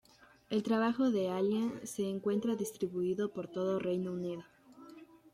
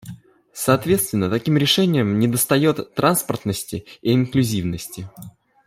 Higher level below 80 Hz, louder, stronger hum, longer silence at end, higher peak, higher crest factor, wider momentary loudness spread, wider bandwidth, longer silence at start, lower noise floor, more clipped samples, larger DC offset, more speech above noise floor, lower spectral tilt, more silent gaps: second, -74 dBFS vs -54 dBFS; second, -35 LUFS vs -19 LUFS; neither; second, 0.2 s vs 0.35 s; second, -18 dBFS vs -2 dBFS; about the same, 16 dB vs 18 dB; second, 10 LU vs 14 LU; about the same, 15 kHz vs 16 kHz; first, 0.5 s vs 0.05 s; first, -55 dBFS vs -40 dBFS; neither; neither; about the same, 22 dB vs 21 dB; about the same, -6 dB/octave vs -5 dB/octave; neither